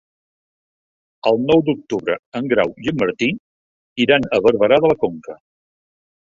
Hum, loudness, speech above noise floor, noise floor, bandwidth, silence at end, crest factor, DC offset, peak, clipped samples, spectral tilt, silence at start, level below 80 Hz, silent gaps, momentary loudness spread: none; -18 LUFS; over 73 dB; under -90 dBFS; 7.4 kHz; 1.05 s; 18 dB; under 0.1%; -2 dBFS; under 0.1%; -6.5 dB/octave; 1.25 s; -54 dBFS; 2.19-2.32 s, 3.39-3.96 s; 10 LU